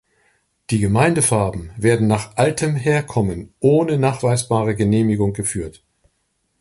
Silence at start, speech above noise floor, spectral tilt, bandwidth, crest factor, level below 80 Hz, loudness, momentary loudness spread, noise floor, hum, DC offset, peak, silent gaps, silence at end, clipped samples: 0.7 s; 51 dB; -6 dB/octave; 11.5 kHz; 16 dB; -42 dBFS; -18 LUFS; 8 LU; -69 dBFS; none; under 0.1%; -2 dBFS; none; 0.9 s; under 0.1%